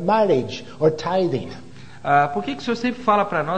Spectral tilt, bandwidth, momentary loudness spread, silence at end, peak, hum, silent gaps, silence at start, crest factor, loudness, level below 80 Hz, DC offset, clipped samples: -6.5 dB/octave; 9.2 kHz; 13 LU; 0 s; -4 dBFS; none; none; 0 s; 18 dB; -21 LUFS; -54 dBFS; 0.9%; under 0.1%